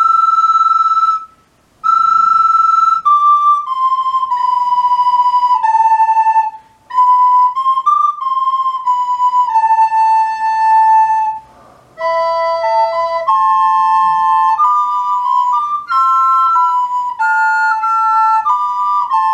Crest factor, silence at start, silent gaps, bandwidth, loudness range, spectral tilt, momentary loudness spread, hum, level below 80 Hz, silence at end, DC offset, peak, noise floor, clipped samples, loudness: 10 dB; 0 s; none; 9.6 kHz; 2 LU; -1.5 dB/octave; 6 LU; none; -62 dBFS; 0 s; under 0.1%; -2 dBFS; -51 dBFS; under 0.1%; -12 LUFS